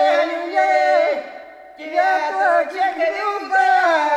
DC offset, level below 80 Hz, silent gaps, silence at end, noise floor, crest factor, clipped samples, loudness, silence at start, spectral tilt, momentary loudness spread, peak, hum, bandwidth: under 0.1%; -70 dBFS; none; 0 s; -38 dBFS; 14 dB; under 0.1%; -18 LUFS; 0 s; -1.5 dB/octave; 10 LU; -4 dBFS; none; 10.5 kHz